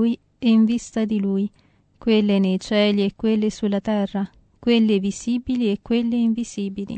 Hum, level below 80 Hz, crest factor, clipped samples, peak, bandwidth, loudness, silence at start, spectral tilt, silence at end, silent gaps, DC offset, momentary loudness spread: none; -52 dBFS; 14 dB; under 0.1%; -6 dBFS; 8.8 kHz; -21 LUFS; 0 s; -6 dB/octave; 0 s; none; under 0.1%; 9 LU